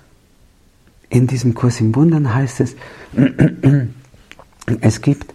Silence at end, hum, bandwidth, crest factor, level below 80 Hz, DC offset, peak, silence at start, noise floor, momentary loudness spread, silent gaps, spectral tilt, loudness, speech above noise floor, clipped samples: 0.1 s; none; 12 kHz; 16 dB; -44 dBFS; under 0.1%; -2 dBFS; 1.1 s; -51 dBFS; 10 LU; none; -7.5 dB/octave; -16 LUFS; 36 dB; under 0.1%